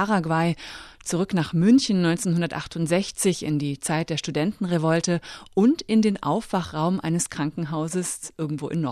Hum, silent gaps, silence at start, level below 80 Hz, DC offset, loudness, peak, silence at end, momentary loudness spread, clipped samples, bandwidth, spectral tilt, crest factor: none; none; 0 s; -56 dBFS; under 0.1%; -24 LUFS; -8 dBFS; 0 s; 9 LU; under 0.1%; 13.5 kHz; -5.5 dB/octave; 16 dB